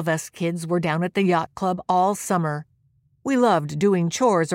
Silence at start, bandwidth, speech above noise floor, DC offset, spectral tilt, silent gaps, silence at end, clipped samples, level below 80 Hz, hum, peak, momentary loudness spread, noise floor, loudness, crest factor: 0 s; 16.5 kHz; 42 dB; under 0.1%; -5.5 dB/octave; none; 0 s; under 0.1%; -62 dBFS; none; -8 dBFS; 7 LU; -63 dBFS; -22 LUFS; 14 dB